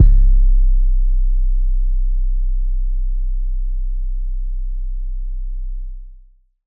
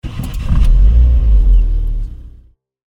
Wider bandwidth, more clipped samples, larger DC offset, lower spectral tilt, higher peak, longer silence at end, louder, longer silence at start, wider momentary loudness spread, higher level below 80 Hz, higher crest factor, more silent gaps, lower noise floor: second, 0.3 kHz vs 4.1 kHz; neither; neither; first, -12 dB/octave vs -8 dB/octave; about the same, 0 dBFS vs -2 dBFS; second, 0.5 s vs 0.7 s; second, -23 LUFS vs -14 LUFS; about the same, 0 s vs 0.05 s; about the same, 12 LU vs 13 LU; about the same, -14 dBFS vs -12 dBFS; about the same, 14 dB vs 10 dB; neither; about the same, -46 dBFS vs -44 dBFS